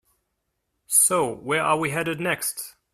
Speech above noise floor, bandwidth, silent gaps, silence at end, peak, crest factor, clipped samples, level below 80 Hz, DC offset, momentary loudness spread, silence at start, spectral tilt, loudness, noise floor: 52 dB; 15.5 kHz; none; 0.25 s; -4 dBFS; 20 dB; under 0.1%; -64 dBFS; under 0.1%; 9 LU; 0.9 s; -2.5 dB/octave; -22 LUFS; -77 dBFS